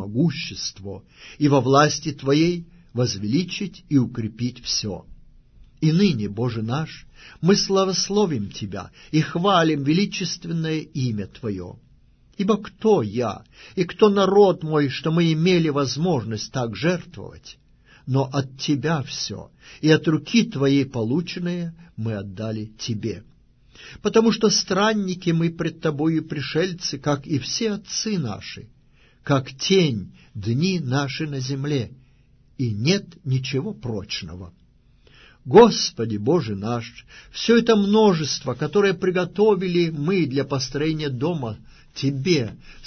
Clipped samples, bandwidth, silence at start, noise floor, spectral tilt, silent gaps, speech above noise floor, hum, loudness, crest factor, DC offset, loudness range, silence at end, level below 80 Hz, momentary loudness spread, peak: under 0.1%; 6.6 kHz; 0 s; -55 dBFS; -5.5 dB/octave; none; 33 dB; none; -22 LUFS; 22 dB; under 0.1%; 6 LU; 0 s; -52 dBFS; 14 LU; 0 dBFS